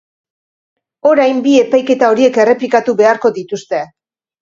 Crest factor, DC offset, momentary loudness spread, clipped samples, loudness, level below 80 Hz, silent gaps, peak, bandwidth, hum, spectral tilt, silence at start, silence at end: 12 dB; under 0.1%; 10 LU; under 0.1%; -12 LUFS; -60 dBFS; none; 0 dBFS; 7.6 kHz; none; -4.5 dB/octave; 1.05 s; 0.55 s